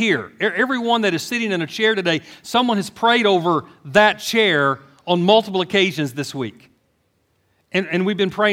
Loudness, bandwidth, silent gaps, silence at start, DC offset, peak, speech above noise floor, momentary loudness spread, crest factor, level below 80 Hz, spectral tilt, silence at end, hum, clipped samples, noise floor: -18 LUFS; 16.5 kHz; none; 0 s; under 0.1%; 0 dBFS; 47 dB; 9 LU; 18 dB; -64 dBFS; -4.5 dB/octave; 0 s; none; under 0.1%; -65 dBFS